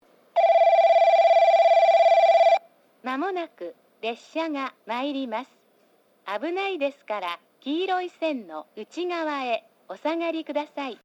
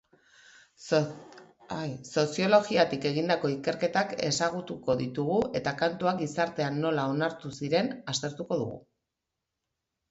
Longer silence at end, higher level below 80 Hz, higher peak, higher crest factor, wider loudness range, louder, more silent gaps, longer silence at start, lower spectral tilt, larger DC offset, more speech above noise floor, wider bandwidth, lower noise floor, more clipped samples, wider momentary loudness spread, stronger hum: second, 0.1 s vs 1.3 s; second, -88 dBFS vs -66 dBFS; about the same, -10 dBFS vs -8 dBFS; second, 12 dB vs 20 dB; first, 13 LU vs 4 LU; first, -23 LUFS vs -29 LUFS; neither; second, 0.35 s vs 0.8 s; second, -3.5 dB/octave vs -5 dB/octave; neither; second, 33 dB vs 57 dB; about the same, 7.8 kHz vs 8.2 kHz; second, -62 dBFS vs -86 dBFS; neither; first, 17 LU vs 10 LU; neither